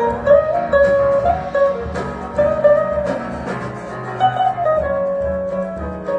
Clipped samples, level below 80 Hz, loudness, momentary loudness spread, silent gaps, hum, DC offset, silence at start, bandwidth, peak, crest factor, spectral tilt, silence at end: under 0.1%; -36 dBFS; -18 LUFS; 12 LU; none; none; under 0.1%; 0 s; 8.8 kHz; 0 dBFS; 16 dB; -7 dB/octave; 0 s